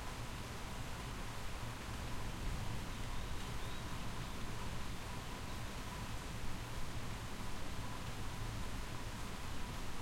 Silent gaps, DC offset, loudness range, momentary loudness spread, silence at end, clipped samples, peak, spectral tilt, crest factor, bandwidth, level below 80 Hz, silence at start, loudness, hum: none; under 0.1%; 1 LU; 2 LU; 0 s; under 0.1%; -28 dBFS; -4.5 dB/octave; 12 dB; 16.5 kHz; -48 dBFS; 0 s; -46 LUFS; none